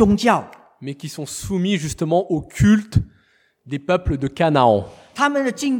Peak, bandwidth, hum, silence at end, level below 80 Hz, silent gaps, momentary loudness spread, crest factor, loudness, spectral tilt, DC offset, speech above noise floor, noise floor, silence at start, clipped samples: -2 dBFS; 18 kHz; none; 0 s; -38 dBFS; none; 15 LU; 18 dB; -19 LUFS; -6 dB/octave; under 0.1%; 41 dB; -60 dBFS; 0 s; under 0.1%